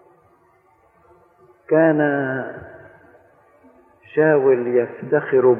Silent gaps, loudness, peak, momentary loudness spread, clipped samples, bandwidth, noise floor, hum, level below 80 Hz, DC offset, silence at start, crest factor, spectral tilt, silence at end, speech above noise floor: none; -18 LUFS; -4 dBFS; 14 LU; under 0.1%; 3.5 kHz; -57 dBFS; none; -66 dBFS; under 0.1%; 1.7 s; 18 dB; -11 dB/octave; 0 s; 40 dB